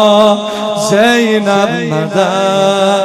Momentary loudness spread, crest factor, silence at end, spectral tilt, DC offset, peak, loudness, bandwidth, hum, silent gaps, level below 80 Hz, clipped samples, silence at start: 6 LU; 10 dB; 0 s; -4.5 dB/octave; under 0.1%; 0 dBFS; -11 LUFS; 14 kHz; none; none; -54 dBFS; 0.2%; 0 s